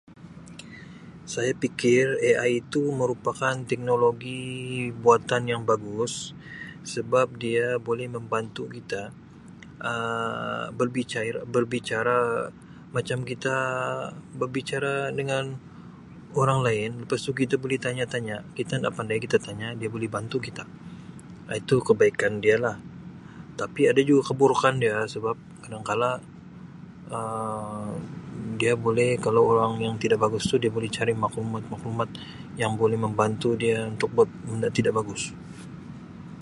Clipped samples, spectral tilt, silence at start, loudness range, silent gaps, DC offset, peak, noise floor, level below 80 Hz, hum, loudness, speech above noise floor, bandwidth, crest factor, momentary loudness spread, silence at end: under 0.1%; -5.5 dB/octave; 0.1 s; 6 LU; none; under 0.1%; -4 dBFS; -46 dBFS; -58 dBFS; none; -26 LUFS; 20 dB; 11.5 kHz; 22 dB; 20 LU; 0 s